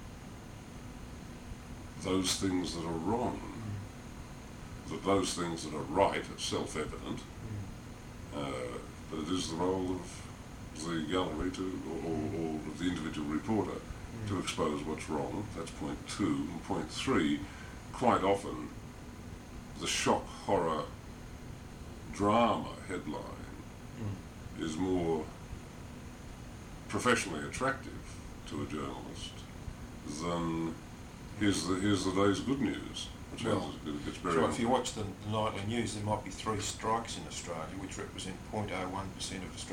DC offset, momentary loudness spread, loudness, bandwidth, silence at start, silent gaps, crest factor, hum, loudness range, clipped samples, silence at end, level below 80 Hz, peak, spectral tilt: under 0.1%; 17 LU; -35 LUFS; 18.5 kHz; 0 s; none; 24 dB; none; 5 LU; under 0.1%; 0 s; -52 dBFS; -12 dBFS; -4.5 dB/octave